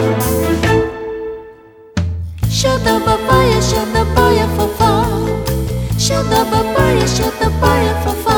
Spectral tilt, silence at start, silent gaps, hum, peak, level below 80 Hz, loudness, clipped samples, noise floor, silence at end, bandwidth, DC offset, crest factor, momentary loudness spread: -5 dB/octave; 0 s; none; none; 0 dBFS; -24 dBFS; -14 LUFS; under 0.1%; -39 dBFS; 0 s; over 20 kHz; under 0.1%; 14 dB; 9 LU